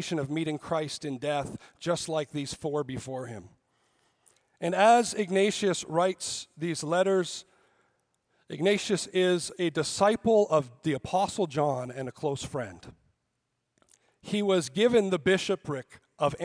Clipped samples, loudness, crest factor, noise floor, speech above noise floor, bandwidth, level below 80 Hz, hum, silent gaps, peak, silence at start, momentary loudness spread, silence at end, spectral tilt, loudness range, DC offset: under 0.1%; -28 LUFS; 20 dB; -80 dBFS; 52 dB; 10.5 kHz; -64 dBFS; none; none; -8 dBFS; 0 s; 13 LU; 0 s; -4.5 dB/octave; 7 LU; under 0.1%